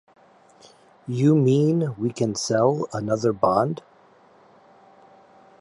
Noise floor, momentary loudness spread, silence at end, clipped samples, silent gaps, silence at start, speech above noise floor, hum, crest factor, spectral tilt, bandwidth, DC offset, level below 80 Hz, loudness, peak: -54 dBFS; 9 LU; 1.85 s; under 0.1%; none; 1.05 s; 33 dB; none; 18 dB; -6.5 dB/octave; 11.5 kHz; under 0.1%; -62 dBFS; -22 LUFS; -6 dBFS